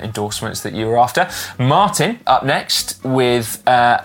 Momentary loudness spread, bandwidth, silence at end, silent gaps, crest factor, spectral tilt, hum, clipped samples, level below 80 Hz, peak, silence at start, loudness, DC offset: 8 LU; 17 kHz; 0 s; none; 14 dB; -4 dB/octave; none; under 0.1%; -50 dBFS; -2 dBFS; 0 s; -16 LUFS; under 0.1%